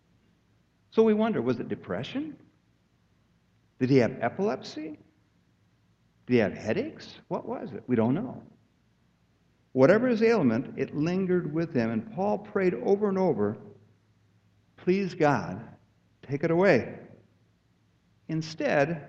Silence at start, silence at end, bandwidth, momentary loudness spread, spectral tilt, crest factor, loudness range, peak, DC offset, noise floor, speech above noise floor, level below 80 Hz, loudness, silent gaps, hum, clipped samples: 0.95 s; 0 s; 7.8 kHz; 15 LU; -7.5 dB/octave; 22 dB; 5 LU; -8 dBFS; under 0.1%; -67 dBFS; 41 dB; -66 dBFS; -27 LUFS; none; none; under 0.1%